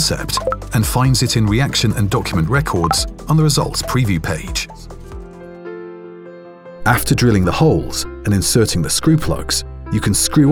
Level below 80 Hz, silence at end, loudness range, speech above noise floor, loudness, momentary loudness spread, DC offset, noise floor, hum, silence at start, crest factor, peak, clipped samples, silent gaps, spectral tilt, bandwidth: -30 dBFS; 0 s; 6 LU; 21 dB; -16 LUFS; 20 LU; under 0.1%; -36 dBFS; none; 0 s; 16 dB; 0 dBFS; under 0.1%; none; -4.5 dB/octave; 19.5 kHz